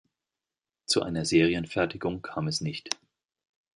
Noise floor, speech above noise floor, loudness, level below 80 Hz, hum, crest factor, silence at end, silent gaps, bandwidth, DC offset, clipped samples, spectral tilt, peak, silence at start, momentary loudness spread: under -90 dBFS; over 62 dB; -28 LUFS; -56 dBFS; none; 22 dB; 0.85 s; none; 11.5 kHz; under 0.1%; under 0.1%; -4.5 dB/octave; -8 dBFS; 0.9 s; 11 LU